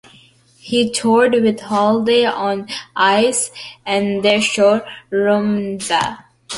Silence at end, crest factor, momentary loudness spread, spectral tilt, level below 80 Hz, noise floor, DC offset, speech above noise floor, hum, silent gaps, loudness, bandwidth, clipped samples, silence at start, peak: 0 s; 14 dB; 9 LU; -3.5 dB/octave; -58 dBFS; -49 dBFS; under 0.1%; 33 dB; none; none; -16 LUFS; 11.5 kHz; under 0.1%; 0.65 s; -2 dBFS